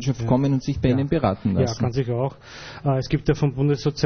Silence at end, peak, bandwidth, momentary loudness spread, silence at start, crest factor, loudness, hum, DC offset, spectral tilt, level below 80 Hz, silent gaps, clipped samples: 0 s; -6 dBFS; 6.6 kHz; 6 LU; 0 s; 16 dB; -22 LUFS; none; under 0.1%; -7.5 dB/octave; -40 dBFS; none; under 0.1%